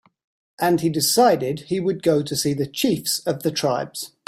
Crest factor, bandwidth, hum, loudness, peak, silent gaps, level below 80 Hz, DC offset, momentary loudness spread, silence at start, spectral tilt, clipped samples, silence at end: 16 dB; 16 kHz; none; -21 LUFS; -4 dBFS; none; -60 dBFS; under 0.1%; 8 LU; 0.6 s; -4 dB/octave; under 0.1%; 0.2 s